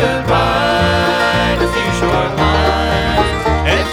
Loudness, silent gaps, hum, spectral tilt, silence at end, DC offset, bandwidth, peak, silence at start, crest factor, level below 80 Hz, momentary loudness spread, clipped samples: -14 LUFS; none; none; -5 dB/octave; 0 s; under 0.1%; 16.5 kHz; -2 dBFS; 0 s; 12 dB; -24 dBFS; 2 LU; under 0.1%